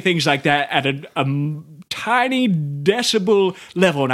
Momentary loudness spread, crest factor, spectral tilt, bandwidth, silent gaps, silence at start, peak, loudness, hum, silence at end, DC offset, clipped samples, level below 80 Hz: 8 LU; 18 dB; -5 dB/octave; 15 kHz; none; 0 s; -2 dBFS; -18 LUFS; none; 0 s; under 0.1%; under 0.1%; -62 dBFS